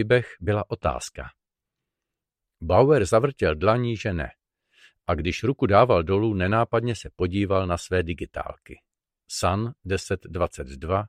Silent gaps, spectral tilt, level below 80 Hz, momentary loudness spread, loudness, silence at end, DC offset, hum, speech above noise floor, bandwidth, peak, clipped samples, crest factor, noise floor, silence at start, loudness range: none; -6 dB/octave; -44 dBFS; 16 LU; -24 LUFS; 0 s; under 0.1%; none; 63 dB; 14 kHz; -4 dBFS; under 0.1%; 20 dB; -86 dBFS; 0 s; 5 LU